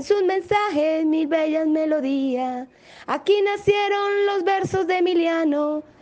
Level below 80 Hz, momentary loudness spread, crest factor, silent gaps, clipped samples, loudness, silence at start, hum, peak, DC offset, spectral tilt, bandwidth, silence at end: -62 dBFS; 6 LU; 14 dB; none; under 0.1%; -21 LUFS; 0 s; none; -6 dBFS; under 0.1%; -5.5 dB/octave; 8.8 kHz; 0.2 s